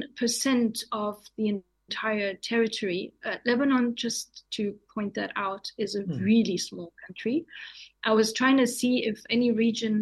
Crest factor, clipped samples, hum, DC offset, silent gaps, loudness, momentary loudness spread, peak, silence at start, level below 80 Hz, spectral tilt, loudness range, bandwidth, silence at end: 18 dB; under 0.1%; none; under 0.1%; none; -27 LUFS; 11 LU; -10 dBFS; 0 s; -68 dBFS; -4 dB/octave; 3 LU; 12.5 kHz; 0 s